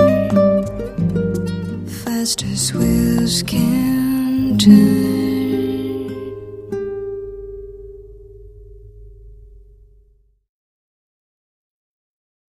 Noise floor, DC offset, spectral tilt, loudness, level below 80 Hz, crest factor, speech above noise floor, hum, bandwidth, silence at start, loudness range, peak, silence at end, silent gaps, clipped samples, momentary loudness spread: -55 dBFS; under 0.1%; -5.5 dB/octave; -17 LUFS; -38 dBFS; 18 dB; 43 dB; none; 15.5 kHz; 0 s; 17 LU; 0 dBFS; 2.95 s; none; under 0.1%; 18 LU